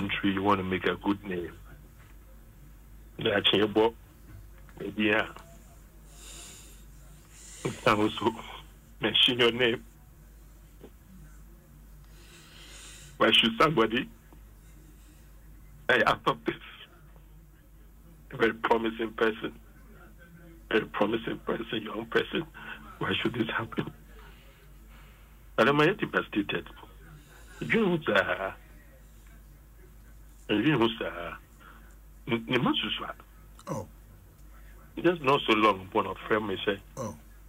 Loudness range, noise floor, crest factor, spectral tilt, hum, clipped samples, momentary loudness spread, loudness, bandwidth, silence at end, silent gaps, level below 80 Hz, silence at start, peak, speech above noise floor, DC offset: 5 LU; -53 dBFS; 20 dB; -5 dB/octave; none; under 0.1%; 23 LU; -28 LUFS; 16 kHz; 0 s; none; -52 dBFS; 0 s; -10 dBFS; 26 dB; under 0.1%